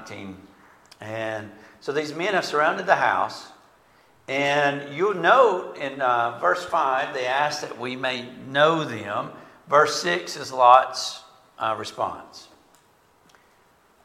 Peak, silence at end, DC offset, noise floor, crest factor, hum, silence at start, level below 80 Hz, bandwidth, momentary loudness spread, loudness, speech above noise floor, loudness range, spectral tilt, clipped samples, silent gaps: 0 dBFS; 1.6 s; under 0.1%; -59 dBFS; 24 dB; none; 0 s; -70 dBFS; 15.5 kHz; 17 LU; -22 LUFS; 36 dB; 4 LU; -3.5 dB/octave; under 0.1%; none